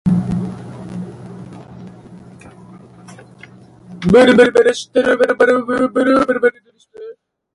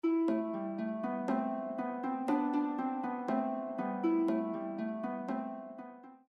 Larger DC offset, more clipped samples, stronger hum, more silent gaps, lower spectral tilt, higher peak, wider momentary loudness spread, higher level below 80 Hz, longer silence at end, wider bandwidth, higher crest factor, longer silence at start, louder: neither; neither; neither; neither; second, -6 dB/octave vs -8.5 dB/octave; first, 0 dBFS vs -20 dBFS; first, 26 LU vs 8 LU; first, -46 dBFS vs -86 dBFS; first, 0.45 s vs 0.15 s; first, 11.5 kHz vs 6.2 kHz; about the same, 16 dB vs 14 dB; about the same, 0.05 s vs 0.05 s; first, -13 LUFS vs -35 LUFS